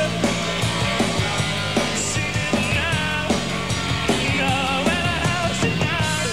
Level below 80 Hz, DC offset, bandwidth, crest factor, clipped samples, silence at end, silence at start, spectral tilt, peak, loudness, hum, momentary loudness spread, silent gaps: -38 dBFS; 0.9%; 16 kHz; 16 dB; under 0.1%; 0 s; 0 s; -4 dB/octave; -6 dBFS; -21 LUFS; none; 2 LU; none